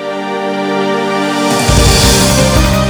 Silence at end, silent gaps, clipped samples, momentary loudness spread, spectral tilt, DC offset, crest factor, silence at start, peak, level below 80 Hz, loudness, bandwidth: 0 s; none; under 0.1%; 9 LU; -4 dB/octave; under 0.1%; 10 dB; 0 s; 0 dBFS; -18 dBFS; -11 LUFS; over 20 kHz